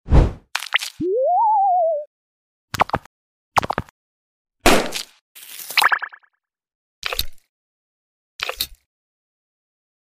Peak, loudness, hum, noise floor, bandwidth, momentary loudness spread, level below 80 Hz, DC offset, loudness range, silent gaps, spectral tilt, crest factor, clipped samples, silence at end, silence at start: 0 dBFS; -20 LUFS; none; -64 dBFS; 16 kHz; 17 LU; -30 dBFS; under 0.1%; 10 LU; 2.07-2.68 s, 3.06-3.52 s, 3.91-4.45 s, 5.21-5.35 s, 6.75-7.02 s, 7.49-8.39 s; -4 dB/octave; 22 dB; under 0.1%; 1.3 s; 0.05 s